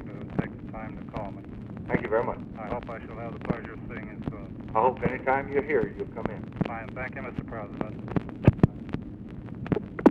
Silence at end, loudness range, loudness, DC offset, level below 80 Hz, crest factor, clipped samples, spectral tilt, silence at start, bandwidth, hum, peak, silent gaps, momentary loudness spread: 0 s; 4 LU; -30 LUFS; under 0.1%; -46 dBFS; 22 dB; under 0.1%; -9.5 dB/octave; 0 s; 6.4 kHz; none; -6 dBFS; none; 14 LU